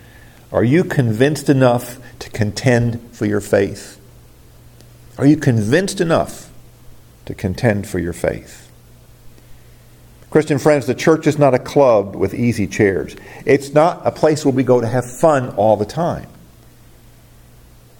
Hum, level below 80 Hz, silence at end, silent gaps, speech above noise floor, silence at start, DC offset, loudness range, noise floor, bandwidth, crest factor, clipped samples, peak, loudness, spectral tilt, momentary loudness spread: none; -46 dBFS; 1.7 s; none; 29 dB; 0.5 s; under 0.1%; 6 LU; -44 dBFS; 17.5 kHz; 16 dB; under 0.1%; 0 dBFS; -16 LUFS; -6.5 dB/octave; 11 LU